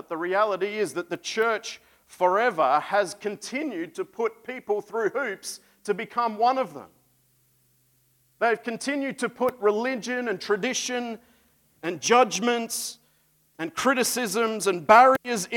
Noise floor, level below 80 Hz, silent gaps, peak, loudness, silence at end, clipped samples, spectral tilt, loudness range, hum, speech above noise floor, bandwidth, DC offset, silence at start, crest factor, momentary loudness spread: -65 dBFS; -72 dBFS; none; -4 dBFS; -25 LUFS; 0 s; under 0.1%; -3 dB/octave; 5 LU; none; 40 dB; 18 kHz; under 0.1%; 0.1 s; 22 dB; 14 LU